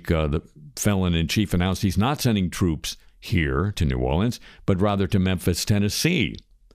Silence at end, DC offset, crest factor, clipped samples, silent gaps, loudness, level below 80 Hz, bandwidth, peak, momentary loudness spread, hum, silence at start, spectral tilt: 0.35 s; under 0.1%; 16 dB; under 0.1%; none; -23 LUFS; -36 dBFS; 15.5 kHz; -8 dBFS; 8 LU; none; 0.05 s; -5.5 dB/octave